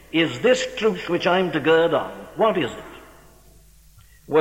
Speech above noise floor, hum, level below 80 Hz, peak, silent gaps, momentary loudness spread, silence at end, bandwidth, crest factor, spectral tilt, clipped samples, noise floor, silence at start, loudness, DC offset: 30 dB; none; -54 dBFS; -4 dBFS; none; 11 LU; 0 s; 16.5 kHz; 18 dB; -5 dB/octave; under 0.1%; -50 dBFS; 0.15 s; -21 LUFS; under 0.1%